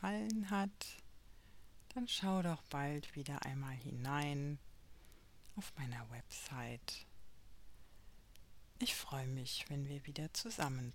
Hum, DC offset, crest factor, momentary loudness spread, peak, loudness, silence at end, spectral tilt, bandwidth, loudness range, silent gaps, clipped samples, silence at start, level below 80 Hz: none; under 0.1%; 22 dB; 11 LU; -22 dBFS; -43 LUFS; 0 s; -4.5 dB/octave; 16.5 kHz; 8 LU; none; under 0.1%; 0 s; -64 dBFS